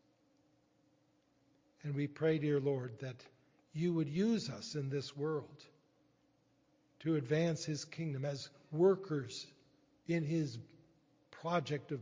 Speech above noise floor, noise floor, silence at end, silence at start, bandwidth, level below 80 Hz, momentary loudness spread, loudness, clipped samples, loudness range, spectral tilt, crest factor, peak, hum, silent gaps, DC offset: 37 dB; -74 dBFS; 0 s; 1.85 s; 7.6 kHz; -78 dBFS; 15 LU; -38 LUFS; under 0.1%; 3 LU; -6.5 dB/octave; 20 dB; -20 dBFS; none; none; under 0.1%